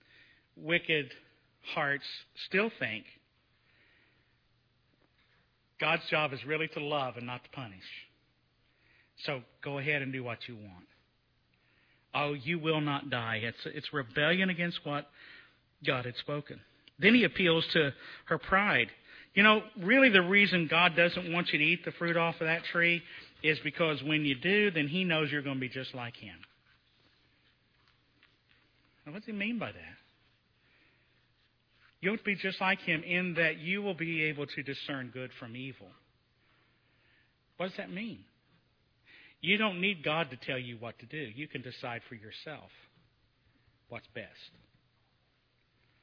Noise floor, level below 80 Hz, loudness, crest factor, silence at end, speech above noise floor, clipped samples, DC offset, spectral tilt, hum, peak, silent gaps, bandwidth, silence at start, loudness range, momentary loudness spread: -73 dBFS; -70 dBFS; -30 LUFS; 26 dB; 1.55 s; 41 dB; under 0.1%; under 0.1%; -7 dB/octave; none; -8 dBFS; none; 5.4 kHz; 0.6 s; 18 LU; 21 LU